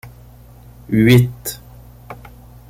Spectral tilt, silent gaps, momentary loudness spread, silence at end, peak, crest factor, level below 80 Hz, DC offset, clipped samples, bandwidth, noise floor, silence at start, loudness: -6.5 dB/octave; none; 25 LU; 0.55 s; -2 dBFS; 18 dB; -42 dBFS; under 0.1%; under 0.1%; 16.5 kHz; -42 dBFS; 0.05 s; -15 LUFS